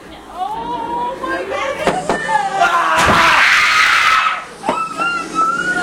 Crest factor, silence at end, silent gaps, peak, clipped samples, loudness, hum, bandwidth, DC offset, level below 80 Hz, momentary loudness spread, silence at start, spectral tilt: 16 dB; 0 s; none; 0 dBFS; under 0.1%; -14 LUFS; none; 17 kHz; under 0.1%; -42 dBFS; 13 LU; 0 s; -2.5 dB/octave